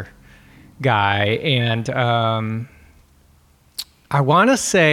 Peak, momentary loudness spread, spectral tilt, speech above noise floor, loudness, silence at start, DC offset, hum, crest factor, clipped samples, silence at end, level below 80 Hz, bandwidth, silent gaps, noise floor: -2 dBFS; 17 LU; -4.5 dB/octave; 37 dB; -18 LUFS; 0 s; under 0.1%; none; 18 dB; under 0.1%; 0 s; -54 dBFS; 15.5 kHz; none; -54 dBFS